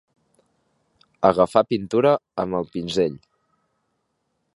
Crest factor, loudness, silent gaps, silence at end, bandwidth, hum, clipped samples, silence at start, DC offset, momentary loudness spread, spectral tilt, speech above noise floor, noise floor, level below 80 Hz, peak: 22 dB; -21 LUFS; none; 1.4 s; 11.5 kHz; none; under 0.1%; 1.2 s; under 0.1%; 8 LU; -6.5 dB/octave; 53 dB; -74 dBFS; -56 dBFS; -2 dBFS